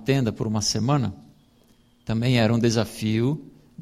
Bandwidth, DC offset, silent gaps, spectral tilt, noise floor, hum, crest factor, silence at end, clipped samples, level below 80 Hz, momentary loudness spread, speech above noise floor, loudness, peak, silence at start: 15 kHz; under 0.1%; none; -5.5 dB/octave; -58 dBFS; none; 18 dB; 0 s; under 0.1%; -52 dBFS; 10 LU; 36 dB; -23 LUFS; -6 dBFS; 0 s